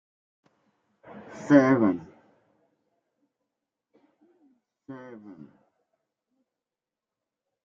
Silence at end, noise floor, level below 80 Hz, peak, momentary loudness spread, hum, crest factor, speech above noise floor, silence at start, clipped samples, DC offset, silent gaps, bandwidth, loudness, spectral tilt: 2.7 s; under -90 dBFS; -74 dBFS; -6 dBFS; 28 LU; none; 26 dB; over 67 dB; 1.35 s; under 0.1%; under 0.1%; none; 7.4 kHz; -22 LUFS; -8 dB/octave